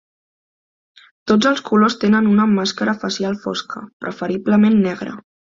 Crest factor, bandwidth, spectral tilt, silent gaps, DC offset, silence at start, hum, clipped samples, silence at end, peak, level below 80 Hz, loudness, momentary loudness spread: 16 dB; 7.6 kHz; -5.5 dB/octave; 3.93-4.00 s; under 0.1%; 1.25 s; none; under 0.1%; 0.35 s; -2 dBFS; -58 dBFS; -17 LUFS; 15 LU